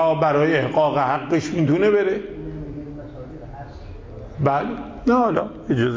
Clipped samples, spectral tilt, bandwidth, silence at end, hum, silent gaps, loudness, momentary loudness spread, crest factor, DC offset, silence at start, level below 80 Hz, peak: under 0.1%; -7.5 dB/octave; 7.6 kHz; 0 s; none; none; -20 LUFS; 19 LU; 14 dB; under 0.1%; 0 s; -44 dBFS; -6 dBFS